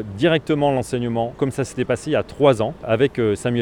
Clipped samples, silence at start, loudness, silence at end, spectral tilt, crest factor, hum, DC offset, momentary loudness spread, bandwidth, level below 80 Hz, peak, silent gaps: under 0.1%; 0 s; -20 LUFS; 0 s; -6 dB/octave; 18 dB; none; under 0.1%; 6 LU; 13 kHz; -48 dBFS; -2 dBFS; none